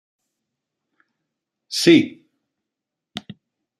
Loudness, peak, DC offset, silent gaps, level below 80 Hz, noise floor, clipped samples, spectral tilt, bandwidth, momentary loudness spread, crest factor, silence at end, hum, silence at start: -17 LUFS; -2 dBFS; under 0.1%; none; -66 dBFS; -84 dBFS; under 0.1%; -4.5 dB/octave; 13.5 kHz; 22 LU; 22 dB; 0.6 s; none; 1.7 s